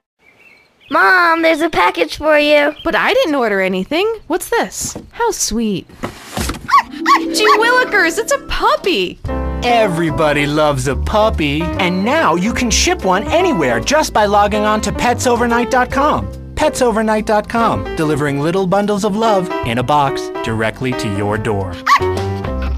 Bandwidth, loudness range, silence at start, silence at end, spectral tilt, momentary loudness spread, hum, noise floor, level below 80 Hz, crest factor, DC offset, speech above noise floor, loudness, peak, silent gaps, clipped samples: 15.5 kHz; 3 LU; 0.9 s; 0 s; -4 dB/octave; 8 LU; none; -47 dBFS; -30 dBFS; 14 dB; under 0.1%; 33 dB; -14 LUFS; 0 dBFS; none; under 0.1%